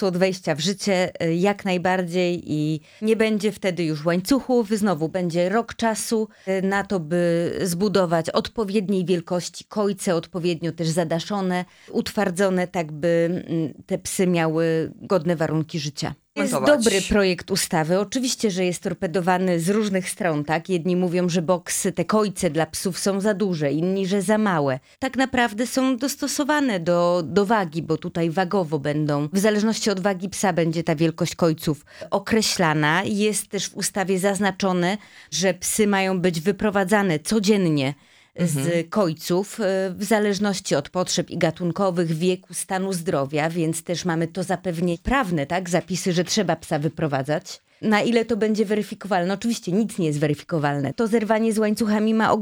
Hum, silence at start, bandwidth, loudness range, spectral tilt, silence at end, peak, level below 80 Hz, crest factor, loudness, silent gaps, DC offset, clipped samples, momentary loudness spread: none; 0 s; over 20 kHz; 2 LU; -5 dB/octave; 0 s; -4 dBFS; -52 dBFS; 18 dB; -22 LUFS; none; under 0.1%; under 0.1%; 6 LU